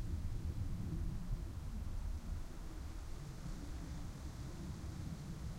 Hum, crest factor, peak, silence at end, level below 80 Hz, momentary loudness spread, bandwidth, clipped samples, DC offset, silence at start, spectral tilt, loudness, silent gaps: none; 14 dB; -28 dBFS; 0 s; -46 dBFS; 6 LU; 16 kHz; under 0.1%; under 0.1%; 0 s; -6.5 dB/octave; -47 LUFS; none